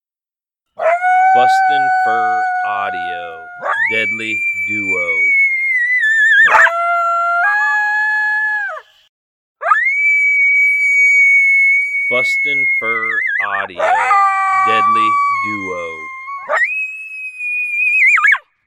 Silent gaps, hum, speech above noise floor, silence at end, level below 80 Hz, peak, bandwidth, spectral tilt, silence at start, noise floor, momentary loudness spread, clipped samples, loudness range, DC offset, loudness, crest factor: 9.09-9.55 s; none; over 75 dB; 0.25 s; -66 dBFS; 0 dBFS; 13.5 kHz; -2 dB/octave; 0.8 s; under -90 dBFS; 13 LU; under 0.1%; 6 LU; under 0.1%; -12 LUFS; 14 dB